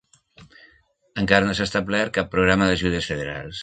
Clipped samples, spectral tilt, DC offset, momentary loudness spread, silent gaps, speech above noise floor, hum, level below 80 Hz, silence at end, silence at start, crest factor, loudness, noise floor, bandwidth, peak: under 0.1%; -5 dB/octave; under 0.1%; 10 LU; none; 38 dB; none; -42 dBFS; 0 s; 0.4 s; 22 dB; -21 LUFS; -59 dBFS; 9.2 kHz; 0 dBFS